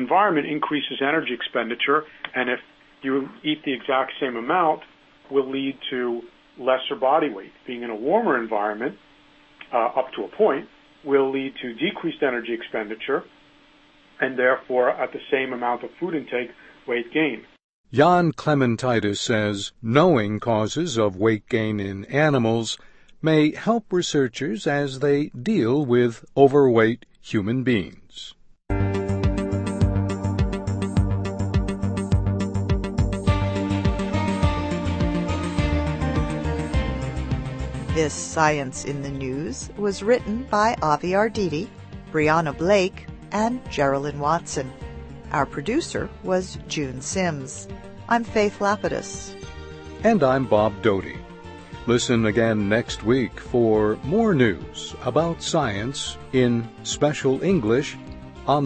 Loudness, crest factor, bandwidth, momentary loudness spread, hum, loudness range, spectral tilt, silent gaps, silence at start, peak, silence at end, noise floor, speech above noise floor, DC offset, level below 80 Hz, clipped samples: -23 LUFS; 22 dB; 8.8 kHz; 11 LU; none; 5 LU; -5.5 dB/octave; 17.64-17.84 s; 0 s; -2 dBFS; 0 s; -54 dBFS; 32 dB; under 0.1%; -38 dBFS; under 0.1%